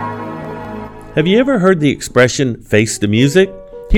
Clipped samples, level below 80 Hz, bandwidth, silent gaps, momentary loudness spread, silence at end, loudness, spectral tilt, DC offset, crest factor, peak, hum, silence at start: under 0.1%; -28 dBFS; 16.5 kHz; none; 15 LU; 0 s; -13 LUFS; -5.5 dB/octave; under 0.1%; 14 dB; 0 dBFS; none; 0 s